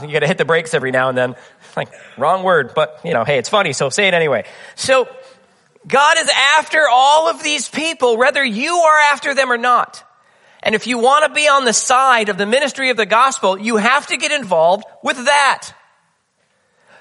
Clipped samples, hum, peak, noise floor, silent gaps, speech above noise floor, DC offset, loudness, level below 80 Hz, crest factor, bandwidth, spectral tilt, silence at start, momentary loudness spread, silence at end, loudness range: under 0.1%; none; 0 dBFS; -63 dBFS; none; 48 dB; under 0.1%; -14 LUFS; -66 dBFS; 16 dB; 11.5 kHz; -2.5 dB/octave; 0 s; 9 LU; 1.3 s; 4 LU